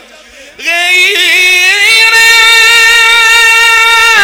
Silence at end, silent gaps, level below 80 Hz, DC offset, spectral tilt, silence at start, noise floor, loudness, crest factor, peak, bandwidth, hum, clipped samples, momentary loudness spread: 0 s; none; -42 dBFS; under 0.1%; 2 dB/octave; 0.6 s; -33 dBFS; -3 LUFS; 6 dB; 0 dBFS; over 20 kHz; none; 5%; 4 LU